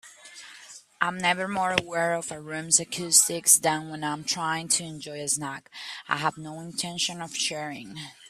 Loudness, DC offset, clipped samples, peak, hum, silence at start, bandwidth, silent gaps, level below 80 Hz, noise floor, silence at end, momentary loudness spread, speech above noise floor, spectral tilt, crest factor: -25 LUFS; under 0.1%; under 0.1%; -2 dBFS; none; 0.05 s; 15.5 kHz; none; -68 dBFS; -48 dBFS; 0 s; 19 LU; 21 dB; -1.5 dB/octave; 26 dB